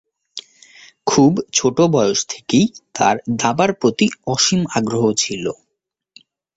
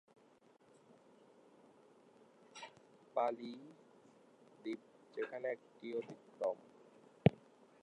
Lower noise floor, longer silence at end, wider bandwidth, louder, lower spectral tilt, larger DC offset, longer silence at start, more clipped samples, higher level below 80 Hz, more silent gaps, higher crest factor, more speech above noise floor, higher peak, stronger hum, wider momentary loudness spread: first, -77 dBFS vs -68 dBFS; first, 1.05 s vs 0.5 s; second, 8 kHz vs 10.5 kHz; first, -17 LUFS vs -42 LUFS; second, -4 dB/octave vs -8 dB/octave; neither; second, 0.35 s vs 2.55 s; neither; first, -54 dBFS vs -72 dBFS; neither; second, 18 dB vs 32 dB; first, 61 dB vs 26 dB; first, 0 dBFS vs -12 dBFS; neither; second, 12 LU vs 27 LU